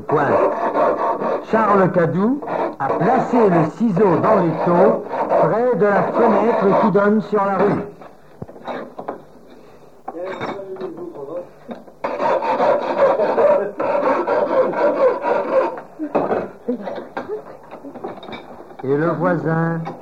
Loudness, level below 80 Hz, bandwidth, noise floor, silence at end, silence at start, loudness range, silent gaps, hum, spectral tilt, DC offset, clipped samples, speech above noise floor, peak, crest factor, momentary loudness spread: -18 LUFS; -60 dBFS; 8.2 kHz; -45 dBFS; 0 s; 0 s; 11 LU; none; none; -8.5 dB/octave; 0.5%; under 0.1%; 29 dB; -2 dBFS; 16 dB; 17 LU